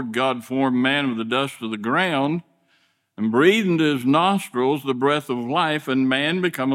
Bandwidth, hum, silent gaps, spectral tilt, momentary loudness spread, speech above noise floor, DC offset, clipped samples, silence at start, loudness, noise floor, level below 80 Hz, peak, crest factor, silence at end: 16 kHz; none; none; -5.5 dB/octave; 6 LU; 43 dB; under 0.1%; under 0.1%; 0 s; -21 LUFS; -64 dBFS; -70 dBFS; -4 dBFS; 18 dB; 0 s